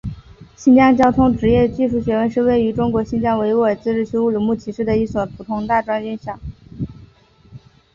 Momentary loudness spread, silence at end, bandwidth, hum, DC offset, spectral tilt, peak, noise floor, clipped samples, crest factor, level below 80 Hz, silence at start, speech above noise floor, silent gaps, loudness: 17 LU; 0.35 s; 7.2 kHz; none; under 0.1%; -8 dB/octave; -2 dBFS; -48 dBFS; under 0.1%; 16 dB; -40 dBFS; 0.05 s; 32 dB; none; -17 LUFS